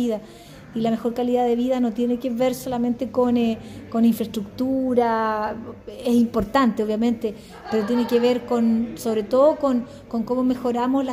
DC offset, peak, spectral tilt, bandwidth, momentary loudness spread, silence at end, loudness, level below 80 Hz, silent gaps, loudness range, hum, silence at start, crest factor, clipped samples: under 0.1%; -6 dBFS; -6 dB/octave; 16 kHz; 9 LU; 0 s; -22 LUFS; -50 dBFS; none; 1 LU; none; 0 s; 16 dB; under 0.1%